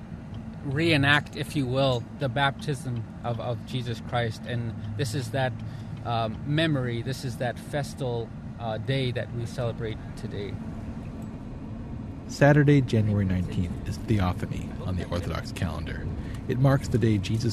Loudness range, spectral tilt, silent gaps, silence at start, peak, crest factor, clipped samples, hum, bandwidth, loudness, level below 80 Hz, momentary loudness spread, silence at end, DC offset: 7 LU; -6.5 dB/octave; none; 0 s; -6 dBFS; 22 dB; under 0.1%; none; 13.5 kHz; -28 LUFS; -44 dBFS; 15 LU; 0 s; under 0.1%